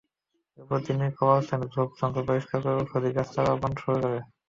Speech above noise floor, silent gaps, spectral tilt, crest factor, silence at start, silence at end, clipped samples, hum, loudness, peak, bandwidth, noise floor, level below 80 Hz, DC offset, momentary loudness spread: 52 dB; none; -8.5 dB/octave; 20 dB; 0.6 s; 0.25 s; under 0.1%; none; -27 LUFS; -8 dBFS; 7.4 kHz; -79 dBFS; -56 dBFS; under 0.1%; 7 LU